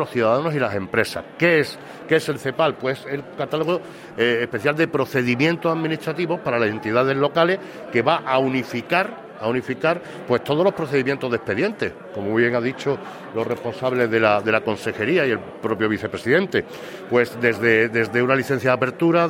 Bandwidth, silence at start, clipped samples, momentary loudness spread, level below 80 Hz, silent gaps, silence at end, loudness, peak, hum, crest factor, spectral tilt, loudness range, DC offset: 16.5 kHz; 0 s; under 0.1%; 9 LU; -60 dBFS; none; 0 s; -21 LUFS; -2 dBFS; none; 20 dB; -6 dB/octave; 2 LU; under 0.1%